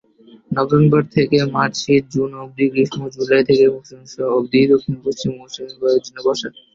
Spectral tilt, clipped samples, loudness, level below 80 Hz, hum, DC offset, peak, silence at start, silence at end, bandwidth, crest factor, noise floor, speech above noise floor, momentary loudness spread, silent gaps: -6.5 dB/octave; under 0.1%; -17 LUFS; -54 dBFS; none; under 0.1%; -2 dBFS; 0.5 s; 0.25 s; 7.6 kHz; 14 dB; -38 dBFS; 21 dB; 11 LU; none